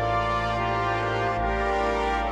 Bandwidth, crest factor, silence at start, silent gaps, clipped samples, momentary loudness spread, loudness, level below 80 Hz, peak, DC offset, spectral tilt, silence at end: 10.5 kHz; 12 dB; 0 s; none; under 0.1%; 1 LU; -25 LUFS; -36 dBFS; -14 dBFS; under 0.1%; -6 dB/octave; 0 s